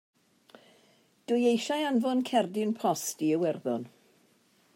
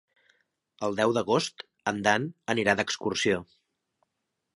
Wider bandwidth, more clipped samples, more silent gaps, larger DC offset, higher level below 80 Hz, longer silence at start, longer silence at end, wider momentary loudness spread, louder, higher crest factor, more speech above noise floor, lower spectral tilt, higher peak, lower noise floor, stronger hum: first, 16 kHz vs 11.5 kHz; neither; neither; neither; second, -86 dBFS vs -64 dBFS; first, 1.3 s vs 0.8 s; second, 0.9 s vs 1.15 s; about the same, 8 LU vs 8 LU; about the same, -29 LUFS vs -27 LUFS; second, 18 dB vs 24 dB; second, 38 dB vs 55 dB; about the same, -4.5 dB/octave vs -4 dB/octave; second, -12 dBFS vs -6 dBFS; second, -66 dBFS vs -82 dBFS; neither